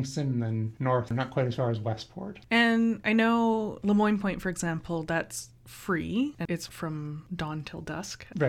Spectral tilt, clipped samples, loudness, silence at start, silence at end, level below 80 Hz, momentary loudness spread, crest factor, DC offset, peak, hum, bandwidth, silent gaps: -6 dB/octave; under 0.1%; -29 LUFS; 0 s; 0 s; -56 dBFS; 13 LU; 18 dB; under 0.1%; -12 dBFS; none; 15 kHz; none